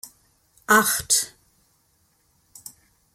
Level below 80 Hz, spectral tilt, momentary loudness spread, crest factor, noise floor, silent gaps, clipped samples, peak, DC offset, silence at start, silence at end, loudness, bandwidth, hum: -62 dBFS; -1 dB/octave; 25 LU; 24 dB; -65 dBFS; none; under 0.1%; -4 dBFS; under 0.1%; 0.05 s; 1.85 s; -20 LUFS; 16.5 kHz; none